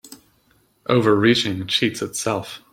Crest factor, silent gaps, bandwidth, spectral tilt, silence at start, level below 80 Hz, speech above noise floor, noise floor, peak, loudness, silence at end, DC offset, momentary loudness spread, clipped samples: 20 dB; none; 16.5 kHz; -4.5 dB/octave; 0.05 s; -58 dBFS; 41 dB; -61 dBFS; -2 dBFS; -20 LUFS; 0.15 s; under 0.1%; 10 LU; under 0.1%